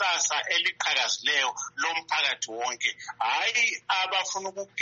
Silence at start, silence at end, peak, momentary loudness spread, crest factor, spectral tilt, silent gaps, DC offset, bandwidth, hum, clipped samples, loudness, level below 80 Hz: 0 s; 0 s; -10 dBFS; 7 LU; 18 dB; 2 dB/octave; none; under 0.1%; 8.2 kHz; none; under 0.1%; -26 LUFS; -82 dBFS